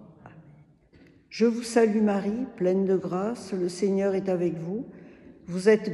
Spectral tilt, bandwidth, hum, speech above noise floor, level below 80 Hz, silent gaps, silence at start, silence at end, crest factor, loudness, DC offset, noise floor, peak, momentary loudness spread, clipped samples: -6.5 dB/octave; 12 kHz; none; 31 dB; -66 dBFS; none; 0 s; 0 s; 18 dB; -26 LUFS; under 0.1%; -56 dBFS; -8 dBFS; 13 LU; under 0.1%